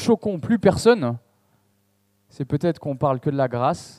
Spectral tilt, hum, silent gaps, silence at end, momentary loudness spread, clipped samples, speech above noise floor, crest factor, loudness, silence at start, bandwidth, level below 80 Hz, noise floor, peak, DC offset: -6.5 dB/octave; none; none; 0.1 s; 10 LU; under 0.1%; 45 dB; 18 dB; -21 LUFS; 0 s; 13 kHz; -54 dBFS; -66 dBFS; -4 dBFS; under 0.1%